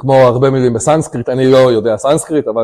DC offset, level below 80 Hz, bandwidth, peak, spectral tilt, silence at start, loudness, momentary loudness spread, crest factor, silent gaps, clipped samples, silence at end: under 0.1%; -44 dBFS; 13 kHz; 0 dBFS; -6 dB/octave; 0.05 s; -11 LUFS; 6 LU; 10 dB; none; under 0.1%; 0 s